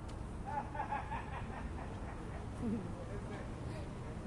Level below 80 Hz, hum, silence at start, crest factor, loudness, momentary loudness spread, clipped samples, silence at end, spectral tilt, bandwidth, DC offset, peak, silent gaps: -50 dBFS; none; 0 s; 14 dB; -44 LUFS; 5 LU; under 0.1%; 0 s; -7 dB/octave; 11.5 kHz; under 0.1%; -28 dBFS; none